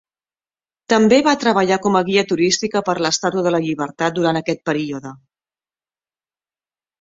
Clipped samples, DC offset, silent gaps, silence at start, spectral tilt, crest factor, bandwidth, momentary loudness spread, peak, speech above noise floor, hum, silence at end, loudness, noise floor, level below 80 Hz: under 0.1%; under 0.1%; none; 0.9 s; -4 dB/octave; 18 dB; 8 kHz; 9 LU; 0 dBFS; over 73 dB; none; 1.85 s; -17 LUFS; under -90 dBFS; -60 dBFS